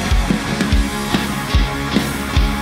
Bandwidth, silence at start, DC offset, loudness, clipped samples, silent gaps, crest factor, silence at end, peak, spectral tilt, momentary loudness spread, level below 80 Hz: 16 kHz; 0 s; under 0.1%; -18 LUFS; under 0.1%; none; 14 dB; 0 s; -2 dBFS; -5 dB/octave; 1 LU; -20 dBFS